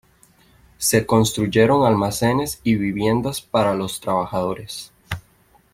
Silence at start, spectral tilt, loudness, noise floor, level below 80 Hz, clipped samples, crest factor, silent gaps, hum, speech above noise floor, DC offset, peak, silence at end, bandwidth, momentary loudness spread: 0.8 s; -5 dB/octave; -20 LUFS; -56 dBFS; -48 dBFS; under 0.1%; 18 dB; none; none; 37 dB; under 0.1%; -2 dBFS; 0.55 s; 16.5 kHz; 16 LU